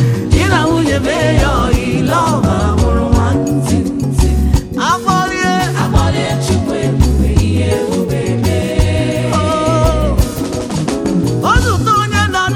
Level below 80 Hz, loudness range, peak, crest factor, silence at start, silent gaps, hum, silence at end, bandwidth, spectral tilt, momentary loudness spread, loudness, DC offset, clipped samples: -20 dBFS; 2 LU; 0 dBFS; 12 dB; 0 s; none; none; 0 s; 16.5 kHz; -6 dB/octave; 4 LU; -13 LUFS; under 0.1%; 0.2%